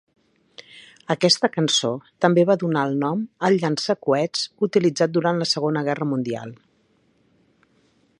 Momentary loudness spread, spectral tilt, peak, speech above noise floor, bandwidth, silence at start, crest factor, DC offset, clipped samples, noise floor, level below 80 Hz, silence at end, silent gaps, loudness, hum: 10 LU; -4.5 dB/octave; -2 dBFS; 42 dB; 11 kHz; 0.75 s; 22 dB; under 0.1%; under 0.1%; -63 dBFS; -70 dBFS; 1.65 s; none; -21 LUFS; none